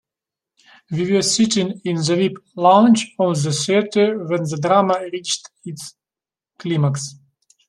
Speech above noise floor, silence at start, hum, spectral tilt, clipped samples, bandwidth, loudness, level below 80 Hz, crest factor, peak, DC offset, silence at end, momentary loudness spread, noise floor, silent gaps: over 72 dB; 0.9 s; none; -5 dB/octave; under 0.1%; 12.5 kHz; -18 LUFS; -64 dBFS; 18 dB; -2 dBFS; under 0.1%; 0.55 s; 17 LU; under -90 dBFS; none